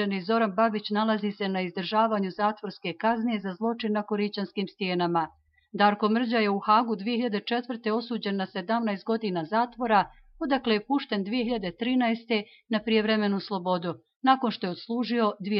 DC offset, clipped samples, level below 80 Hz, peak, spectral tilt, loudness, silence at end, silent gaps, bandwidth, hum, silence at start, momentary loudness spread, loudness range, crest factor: under 0.1%; under 0.1%; -64 dBFS; -8 dBFS; -9 dB/octave; -27 LUFS; 0 s; 14.16-14.21 s; 5.8 kHz; none; 0 s; 7 LU; 2 LU; 18 dB